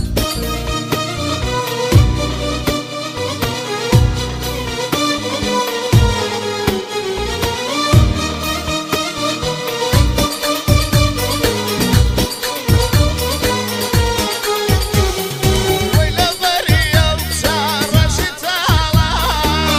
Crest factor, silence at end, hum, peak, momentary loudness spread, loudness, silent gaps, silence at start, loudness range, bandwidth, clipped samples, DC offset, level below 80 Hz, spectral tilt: 16 dB; 0 s; none; 0 dBFS; 6 LU; -16 LUFS; none; 0 s; 3 LU; 16 kHz; under 0.1%; under 0.1%; -24 dBFS; -4.5 dB/octave